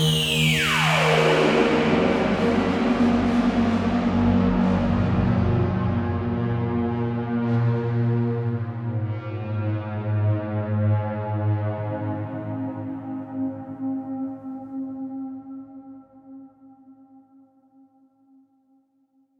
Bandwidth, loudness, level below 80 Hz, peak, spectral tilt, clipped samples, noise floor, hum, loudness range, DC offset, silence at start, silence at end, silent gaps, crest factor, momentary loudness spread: 18 kHz; -23 LUFS; -44 dBFS; -6 dBFS; -6 dB/octave; under 0.1%; -65 dBFS; none; 14 LU; under 0.1%; 0 s; 2.45 s; none; 16 dB; 14 LU